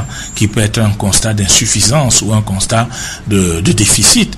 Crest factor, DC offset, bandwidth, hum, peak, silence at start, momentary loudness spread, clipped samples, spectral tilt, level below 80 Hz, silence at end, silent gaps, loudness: 12 dB; under 0.1%; 16 kHz; none; 0 dBFS; 0 s; 8 LU; 0.2%; -3.5 dB/octave; -28 dBFS; 0 s; none; -10 LUFS